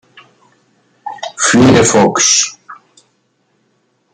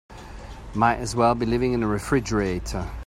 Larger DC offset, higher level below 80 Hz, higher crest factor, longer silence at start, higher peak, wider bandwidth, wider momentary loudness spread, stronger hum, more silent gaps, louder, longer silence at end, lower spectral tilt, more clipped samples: neither; second, -46 dBFS vs -38 dBFS; second, 14 dB vs 20 dB; first, 1.05 s vs 0.1 s; first, 0 dBFS vs -4 dBFS; second, 11 kHz vs 16 kHz; about the same, 19 LU vs 19 LU; neither; neither; first, -9 LUFS vs -24 LUFS; first, 1.4 s vs 0 s; second, -3 dB/octave vs -6 dB/octave; neither